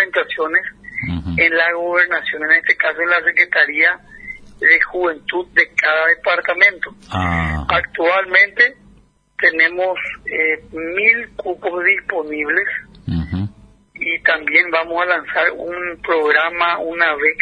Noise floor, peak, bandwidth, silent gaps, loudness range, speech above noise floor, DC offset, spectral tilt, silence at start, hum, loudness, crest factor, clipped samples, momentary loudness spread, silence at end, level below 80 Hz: -51 dBFS; 0 dBFS; 10 kHz; none; 4 LU; 34 dB; under 0.1%; -5.5 dB/octave; 0 s; none; -15 LUFS; 18 dB; under 0.1%; 12 LU; 0 s; -42 dBFS